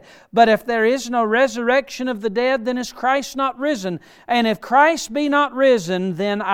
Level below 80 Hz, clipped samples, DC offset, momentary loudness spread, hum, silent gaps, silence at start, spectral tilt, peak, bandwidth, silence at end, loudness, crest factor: -58 dBFS; under 0.1%; under 0.1%; 8 LU; none; none; 0.35 s; -4.5 dB/octave; -2 dBFS; 16.5 kHz; 0 s; -19 LUFS; 16 dB